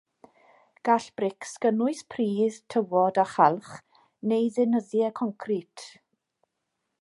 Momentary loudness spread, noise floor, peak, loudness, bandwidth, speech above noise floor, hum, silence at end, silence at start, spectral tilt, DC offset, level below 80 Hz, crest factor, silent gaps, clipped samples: 13 LU; -81 dBFS; -6 dBFS; -26 LUFS; 11.5 kHz; 55 dB; none; 1.1 s; 0.85 s; -6 dB/octave; under 0.1%; -78 dBFS; 22 dB; none; under 0.1%